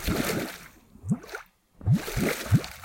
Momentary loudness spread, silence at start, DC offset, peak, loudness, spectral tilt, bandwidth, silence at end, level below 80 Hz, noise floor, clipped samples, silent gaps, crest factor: 17 LU; 0 s; under 0.1%; -10 dBFS; -28 LUFS; -5.5 dB/octave; 17 kHz; 0 s; -42 dBFS; -49 dBFS; under 0.1%; none; 18 dB